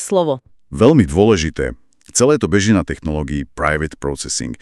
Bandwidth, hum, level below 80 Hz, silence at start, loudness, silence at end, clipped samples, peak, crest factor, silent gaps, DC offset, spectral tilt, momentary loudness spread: 13 kHz; none; -34 dBFS; 0 s; -16 LUFS; 0.05 s; under 0.1%; 0 dBFS; 16 dB; none; under 0.1%; -5 dB/octave; 12 LU